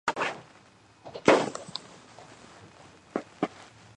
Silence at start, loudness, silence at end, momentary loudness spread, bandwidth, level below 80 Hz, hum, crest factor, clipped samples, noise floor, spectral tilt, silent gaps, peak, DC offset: 0.05 s; -29 LUFS; 0.35 s; 27 LU; 11 kHz; -68 dBFS; none; 26 dB; under 0.1%; -57 dBFS; -4 dB/octave; none; -4 dBFS; under 0.1%